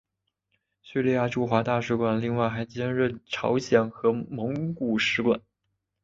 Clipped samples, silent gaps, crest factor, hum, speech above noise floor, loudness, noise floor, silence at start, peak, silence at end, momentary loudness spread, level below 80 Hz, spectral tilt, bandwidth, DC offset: under 0.1%; none; 20 dB; none; 54 dB; -26 LUFS; -80 dBFS; 0.85 s; -6 dBFS; 0.65 s; 7 LU; -60 dBFS; -6.5 dB/octave; 7.6 kHz; under 0.1%